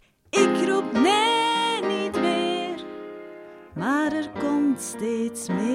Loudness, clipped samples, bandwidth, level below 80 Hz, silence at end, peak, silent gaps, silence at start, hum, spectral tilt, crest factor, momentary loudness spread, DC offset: -23 LUFS; under 0.1%; 16 kHz; -64 dBFS; 0 s; -8 dBFS; none; 0.35 s; none; -4 dB/octave; 16 dB; 18 LU; under 0.1%